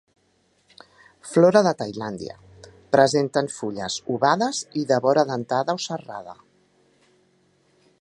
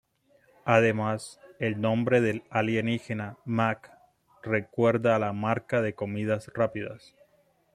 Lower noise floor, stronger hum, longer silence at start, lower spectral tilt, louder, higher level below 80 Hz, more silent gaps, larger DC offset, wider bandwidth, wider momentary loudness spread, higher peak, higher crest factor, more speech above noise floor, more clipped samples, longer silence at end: about the same, -65 dBFS vs -66 dBFS; neither; first, 1.25 s vs 0.65 s; second, -5 dB/octave vs -7 dB/octave; first, -22 LUFS vs -27 LUFS; about the same, -64 dBFS vs -66 dBFS; neither; neither; about the same, 11.5 kHz vs 12 kHz; first, 18 LU vs 13 LU; first, -2 dBFS vs -6 dBFS; about the same, 22 dB vs 22 dB; first, 43 dB vs 39 dB; neither; first, 1.7 s vs 0.75 s